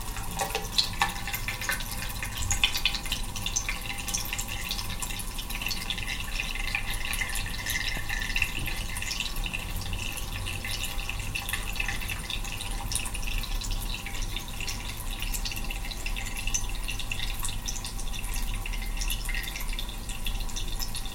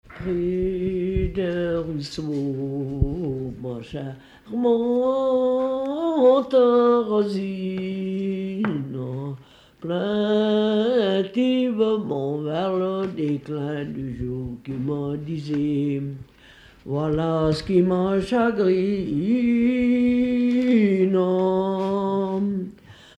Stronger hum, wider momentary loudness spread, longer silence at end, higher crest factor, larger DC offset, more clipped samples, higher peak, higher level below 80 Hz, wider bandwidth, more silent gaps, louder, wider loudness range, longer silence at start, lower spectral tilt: neither; second, 7 LU vs 11 LU; second, 0 s vs 0.25 s; first, 24 dB vs 16 dB; neither; neither; about the same, -6 dBFS vs -6 dBFS; first, -34 dBFS vs -42 dBFS; first, 17 kHz vs 9.6 kHz; neither; second, -31 LUFS vs -23 LUFS; second, 4 LU vs 7 LU; about the same, 0 s vs 0.1 s; second, -2 dB/octave vs -8 dB/octave